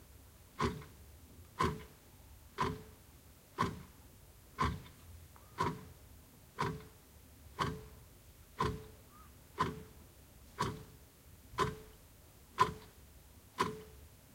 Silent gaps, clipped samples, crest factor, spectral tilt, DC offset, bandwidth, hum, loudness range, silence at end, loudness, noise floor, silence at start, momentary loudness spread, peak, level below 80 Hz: none; under 0.1%; 28 dB; -5 dB/octave; under 0.1%; 16.5 kHz; none; 3 LU; 0.15 s; -40 LUFS; -60 dBFS; 0 s; 21 LU; -14 dBFS; -56 dBFS